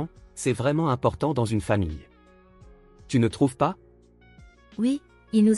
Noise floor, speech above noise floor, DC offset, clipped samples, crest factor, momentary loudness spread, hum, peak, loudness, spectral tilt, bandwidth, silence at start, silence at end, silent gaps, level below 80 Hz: -55 dBFS; 32 dB; under 0.1%; under 0.1%; 18 dB; 10 LU; none; -8 dBFS; -26 LUFS; -7 dB/octave; 12 kHz; 0 s; 0 s; none; -48 dBFS